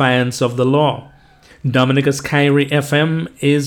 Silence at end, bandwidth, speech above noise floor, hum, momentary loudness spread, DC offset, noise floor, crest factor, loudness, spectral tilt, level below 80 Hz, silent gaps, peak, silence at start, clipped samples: 0 s; 17.5 kHz; 31 dB; none; 5 LU; under 0.1%; -46 dBFS; 16 dB; -16 LUFS; -6 dB/octave; -52 dBFS; none; 0 dBFS; 0 s; under 0.1%